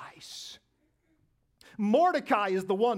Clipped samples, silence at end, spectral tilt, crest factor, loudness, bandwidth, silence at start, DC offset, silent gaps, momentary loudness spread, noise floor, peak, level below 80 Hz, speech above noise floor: under 0.1%; 0 s; -5.5 dB/octave; 18 dB; -27 LUFS; 15.5 kHz; 0 s; under 0.1%; none; 19 LU; -73 dBFS; -12 dBFS; -76 dBFS; 47 dB